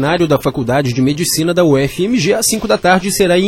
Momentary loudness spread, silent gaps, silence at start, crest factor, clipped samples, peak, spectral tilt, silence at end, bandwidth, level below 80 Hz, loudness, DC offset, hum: 3 LU; none; 0 s; 12 dB; under 0.1%; 0 dBFS; -4.5 dB/octave; 0 s; 17 kHz; -40 dBFS; -13 LUFS; under 0.1%; none